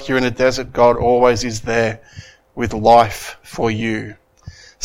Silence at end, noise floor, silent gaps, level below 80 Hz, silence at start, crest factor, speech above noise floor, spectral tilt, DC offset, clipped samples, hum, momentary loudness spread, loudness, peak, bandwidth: 0 s; -40 dBFS; none; -38 dBFS; 0 s; 18 dB; 24 dB; -5 dB/octave; under 0.1%; under 0.1%; none; 18 LU; -16 LUFS; 0 dBFS; 16 kHz